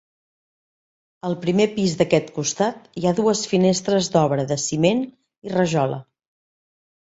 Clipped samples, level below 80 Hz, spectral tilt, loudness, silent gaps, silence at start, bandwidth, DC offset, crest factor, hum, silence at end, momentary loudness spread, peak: under 0.1%; -58 dBFS; -5 dB/octave; -21 LUFS; 5.38-5.42 s; 1.25 s; 8 kHz; under 0.1%; 18 dB; none; 1 s; 8 LU; -4 dBFS